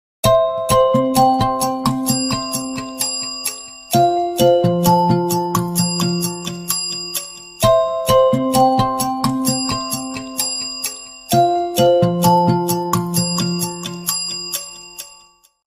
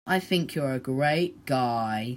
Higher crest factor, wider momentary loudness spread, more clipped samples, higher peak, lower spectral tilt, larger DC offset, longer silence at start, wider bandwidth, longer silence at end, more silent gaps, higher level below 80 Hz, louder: about the same, 16 dB vs 16 dB; first, 10 LU vs 4 LU; neither; first, 0 dBFS vs -10 dBFS; second, -4.5 dB/octave vs -6 dB/octave; neither; first, 0.25 s vs 0.05 s; about the same, 16 kHz vs 16 kHz; first, 0.6 s vs 0 s; neither; first, -44 dBFS vs -64 dBFS; first, -17 LUFS vs -27 LUFS